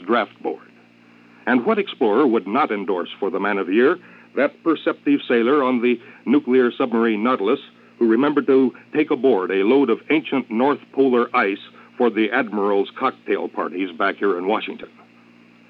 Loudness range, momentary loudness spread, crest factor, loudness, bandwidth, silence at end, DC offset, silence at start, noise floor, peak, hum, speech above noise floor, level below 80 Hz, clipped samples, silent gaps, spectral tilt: 3 LU; 8 LU; 14 dB; -20 LUFS; 5.2 kHz; 0.85 s; under 0.1%; 0 s; -50 dBFS; -6 dBFS; none; 31 dB; -82 dBFS; under 0.1%; none; -8 dB/octave